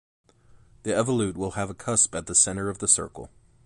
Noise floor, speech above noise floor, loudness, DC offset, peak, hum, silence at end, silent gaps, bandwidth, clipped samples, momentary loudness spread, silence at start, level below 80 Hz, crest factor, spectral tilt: -56 dBFS; 31 dB; -23 LUFS; under 0.1%; -6 dBFS; none; 0.4 s; none; 11.5 kHz; under 0.1%; 13 LU; 0.85 s; -52 dBFS; 22 dB; -3.5 dB/octave